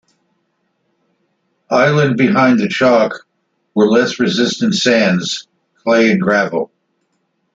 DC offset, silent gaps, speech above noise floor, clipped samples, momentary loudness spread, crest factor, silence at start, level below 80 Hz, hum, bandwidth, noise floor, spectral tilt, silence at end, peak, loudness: under 0.1%; none; 53 dB; under 0.1%; 11 LU; 14 dB; 1.7 s; -58 dBFS; none; 7.8 kHz; -66 dBFS; -5 dB/octave; 0.9 s; 0 dBFS; -14 LUFS